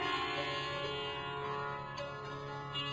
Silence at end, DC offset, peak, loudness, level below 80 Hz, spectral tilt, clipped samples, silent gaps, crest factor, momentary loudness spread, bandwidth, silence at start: 0 s; under 0.1%; -24 dBFS; -39 LUFS; -62 dBFS; -4.5 dB/octave; under 0.1%; none; 16 dB; 7 LU; 8 kHz; 0 s